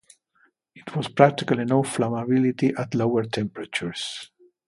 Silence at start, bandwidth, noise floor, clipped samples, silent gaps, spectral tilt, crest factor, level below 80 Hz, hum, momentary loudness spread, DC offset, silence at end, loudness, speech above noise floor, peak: 0.75 s; 11.5 kHz; -65 dBFS; under 0.1%; none; -6 dB/octave; 24 dB; -62 dBFS; none; 13 LU; under 0.1%; 0.45 s; -24 LUFS; 42 dB; 0 dBFS